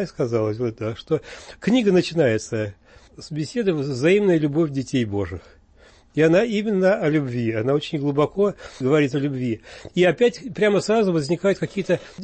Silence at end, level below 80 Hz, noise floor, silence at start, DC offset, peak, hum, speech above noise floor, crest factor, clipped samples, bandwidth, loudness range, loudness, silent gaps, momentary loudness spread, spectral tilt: 0 s; -54 dBFS; -52 dBFS; 0 s; under 0.1%; -8 dBFS; none; 31 dB; 14 dB; under 0.1%; 8.8 kHz; 2 LU; -21 LUFS; none; 11 LU; -6.5 dB/octave